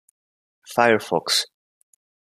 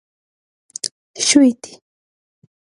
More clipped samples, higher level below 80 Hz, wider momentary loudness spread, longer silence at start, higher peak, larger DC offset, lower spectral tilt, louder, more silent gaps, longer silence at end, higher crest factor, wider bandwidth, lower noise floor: neither; about the same, -70 dBFS vs -66 dBFS; second, 9 LU vs 22 LU; second, 0.7 s vs 0.85 s; about the same, -2 dBFS vs 0 dBFS; neither; about the same, -2.5 dB/octave vs -1.5 dB/octave; second, -20 LUFS vs -16 LUFS; second, none vs 0.91-1.14 s; about the same, 0.95 s vs 1.05 s; about the same, 22 dB vs 20 dB; first, 15 kHz vs 11.5 kHz; about the same, under -90 dBFS vs under -90 dBFS